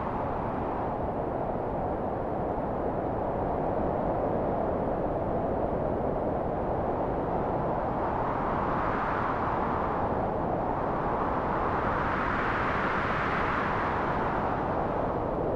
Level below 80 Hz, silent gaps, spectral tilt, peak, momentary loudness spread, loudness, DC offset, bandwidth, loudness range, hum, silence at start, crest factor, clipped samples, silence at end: -42 dBFS; none; -8.5 dB/octave; -14 dBFS; 3 LU; -29 LUFS; under 0.1%; 11 kHz; 2 LU; none; 0 s; 14 dB; under 0.1%; 0 s